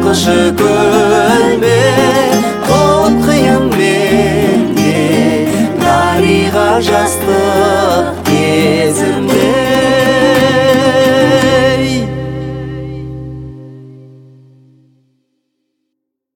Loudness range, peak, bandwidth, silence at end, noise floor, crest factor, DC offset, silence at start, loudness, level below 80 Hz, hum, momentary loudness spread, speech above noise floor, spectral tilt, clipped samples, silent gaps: 9 LU; 0 dBFS; 17.5 kHz; 2.3 s; -73 dBFS; 10 dB; under 0.1%; 0 s; -10 LUFS; -38 dBFS; none; 11 LU; 64 dB; -5 dB/octave; under 0.1%; none